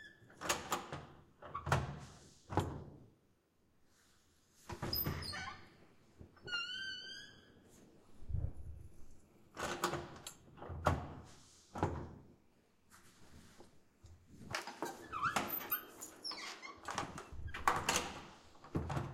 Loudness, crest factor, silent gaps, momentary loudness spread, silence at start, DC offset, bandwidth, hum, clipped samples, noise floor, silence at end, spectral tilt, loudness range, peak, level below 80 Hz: -42 LUFS; 30 dB; none; 23 LU; 0 s; under 0.1%; 16 kHz; none; under 0.1%; -74 dBFS; 0 s; -3.5 dB/octave; 7 LU; -14 dBFS; -58 dBFS